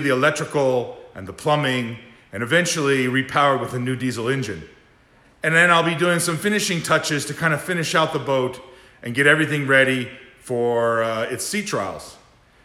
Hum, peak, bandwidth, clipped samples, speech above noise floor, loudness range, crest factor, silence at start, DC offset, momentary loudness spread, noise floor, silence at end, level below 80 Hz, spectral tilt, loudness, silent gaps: none; -2 dBFS; 18.5 kHz; under 0.1%; 34 dB; 2 LU; 20 dB; 0 s; under 0.1%; 15 LU; -54 dBFS; 0.5 s; -60 dBFS; -4 dB/octave; -20 LUFS; none